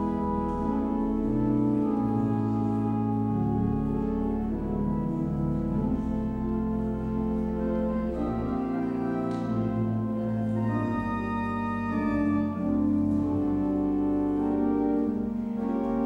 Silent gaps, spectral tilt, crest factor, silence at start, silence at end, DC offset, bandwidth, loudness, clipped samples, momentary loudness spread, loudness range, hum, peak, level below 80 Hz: none; -10 dB/octave; 12 dB; 0 s; 0 s; under 0.1%; 5.2 kHz; -28 LUFS; under 0.1%; 4 LU; 2 LU; none; -14 dBFS; -42 dBFS